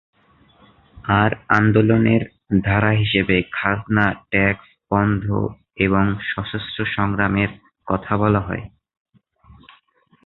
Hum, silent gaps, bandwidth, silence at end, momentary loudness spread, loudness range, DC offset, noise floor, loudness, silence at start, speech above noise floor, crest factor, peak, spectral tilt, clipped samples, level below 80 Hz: none; none; 5.2 kHz; 1.6 s; 10 LU; 5 LU; under 0.1%; -58 dBFS; -19 LUFS; 0.95 s; 39 dB; 18 dB; -2 dBFS; -9 dB/octave; under 0.1%; -42 dBFS